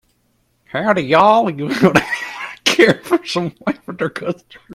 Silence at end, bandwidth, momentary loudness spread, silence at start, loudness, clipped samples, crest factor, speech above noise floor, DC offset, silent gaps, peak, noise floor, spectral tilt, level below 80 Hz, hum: 0 s; 16 kHz; 13 LU; 0.75 s; -16 LUFS; under 0.1%; 16 dB; 47 dB; under 0.1%; none; 0 dBFS; -62 dBFS; -5 dB/octave; -54 dBFS; none